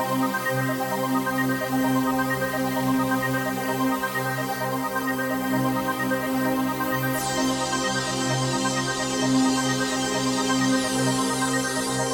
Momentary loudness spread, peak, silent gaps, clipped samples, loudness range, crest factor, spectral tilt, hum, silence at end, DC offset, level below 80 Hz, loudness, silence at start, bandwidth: 3 LU; -10 dBFS; none; under 0.1%; 2 LU; 14 dB; -4 dB/octave; none; 0 s; under 0.1%; -54 dBFS; -24 LUFS; 0 s; 17.5 kHz